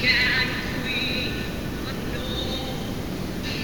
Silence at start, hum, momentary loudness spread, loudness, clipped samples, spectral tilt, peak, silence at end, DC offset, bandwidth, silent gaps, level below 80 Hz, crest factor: 0 s; none; 10 LU; -26 LUFS; under 0.1%; -4 dB/octave; -8 dBFS; 0 s; 0.9%; 19.5 kHz; none; -38 dBFS; 20 dB